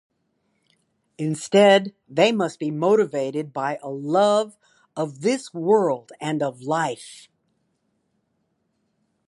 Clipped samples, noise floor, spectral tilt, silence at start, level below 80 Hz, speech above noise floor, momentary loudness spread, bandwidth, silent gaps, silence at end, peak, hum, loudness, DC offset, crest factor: under 0.1%; -72 dBFS; -5 dB/octave; 1.2 s; -76 dBFS; 50 dB; 13 LU; 11.5 kHz; none; 2.1 s; -2 dBFS; none; -22 LUFS; under 0.1%; 20 dB